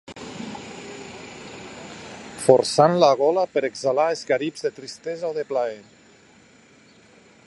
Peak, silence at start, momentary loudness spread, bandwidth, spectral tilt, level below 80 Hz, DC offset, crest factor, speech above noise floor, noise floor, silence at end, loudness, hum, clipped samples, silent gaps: 0 dBFS; 0.1 s; 21 LU; 11.5 kHz; -4.5 dB/octave; -64 dBFS; under 0.1%; 24 dB; 32 dB; -53 dBFS; 1.65 s; -21 LUFS; none; under 0.1%; none